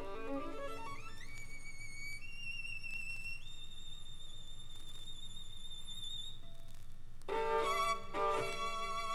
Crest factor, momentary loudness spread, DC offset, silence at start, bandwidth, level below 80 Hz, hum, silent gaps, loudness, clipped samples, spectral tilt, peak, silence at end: 16 dB; 16 LU; under 0.1%; 0 s; 12.5 kHz; -48 dBFS; none; none; -42 LUFS; under 0.1%; -3 dB/octave; -24 dBFS; 0 s